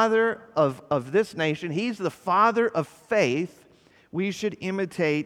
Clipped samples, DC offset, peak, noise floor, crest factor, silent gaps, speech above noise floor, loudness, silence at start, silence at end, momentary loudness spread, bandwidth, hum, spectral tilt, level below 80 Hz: under 0.1%; under 0.1%; -8 dBFS; -57 dBFS; 18 dB; none; 33 dB; -25 LUFS; 0 s; 0 s; 9 LU; 14 kHz; none; -6 dB/octave; -68 dBFS